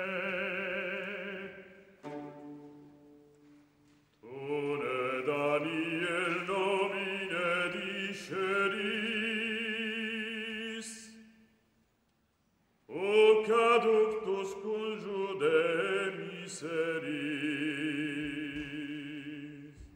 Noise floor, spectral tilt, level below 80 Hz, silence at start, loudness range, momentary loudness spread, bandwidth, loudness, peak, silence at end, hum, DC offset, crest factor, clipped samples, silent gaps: -74 dBFS; -4.5 dB/octave; -70 dBFS; 0 s; 12 LU; 18 LU; 16 kHz; -32 LUFS; -14 dBFS; 0 s; none; under 0.1%; 20 dB; under 0.1%; none